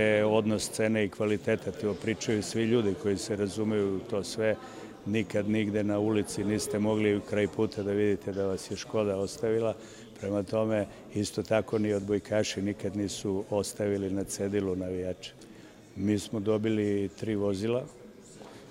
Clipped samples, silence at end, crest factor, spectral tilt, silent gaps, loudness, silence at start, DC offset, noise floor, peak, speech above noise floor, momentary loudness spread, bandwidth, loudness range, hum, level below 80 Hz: under 0.1%; 0 s; 18 dB; -5.5 dB/octave; none; -30 LUFS; 0 s; under 0.1%; -51 dBFS; -12 dBFS; 21 dB; 8 LU; 16 kHz; 3 LU; none; -62 dBFS